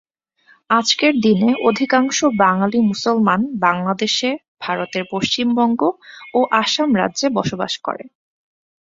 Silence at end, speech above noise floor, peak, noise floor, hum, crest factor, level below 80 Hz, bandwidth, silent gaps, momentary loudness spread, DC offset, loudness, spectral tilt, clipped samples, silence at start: 0.85 s; 38 dB; -2 dBFS; -55 dBFS; none; 16 dB; -58 dBFS; 7.8 kHz; 4.48-4.57 s; 8 LU; under 0.1%; -17 LUFS; -4 dB/octave; under 0.1%; 0.7 s